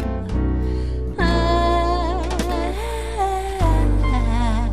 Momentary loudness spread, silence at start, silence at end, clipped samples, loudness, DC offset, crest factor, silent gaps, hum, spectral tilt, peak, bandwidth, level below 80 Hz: 7 LU; 0 s; 0 s; under 0.1%; -21 LUFS; 1%; 14 dB; none; none; -6.5 dB/octave; -6 dBFS; 13 kHz; -22 dBFS